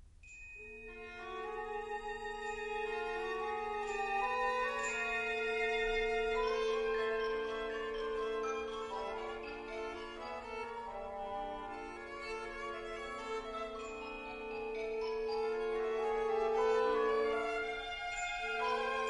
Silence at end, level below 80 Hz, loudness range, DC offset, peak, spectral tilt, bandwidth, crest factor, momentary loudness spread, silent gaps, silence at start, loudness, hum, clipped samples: 0 s; -58 dBFS; 8 LU; under 0.1%; -22 dBFS; -3 dB/octave; 10.5 kHz; 16 dB; 10 LU; none; 0 s; -38 LUFS; none; under 0.1%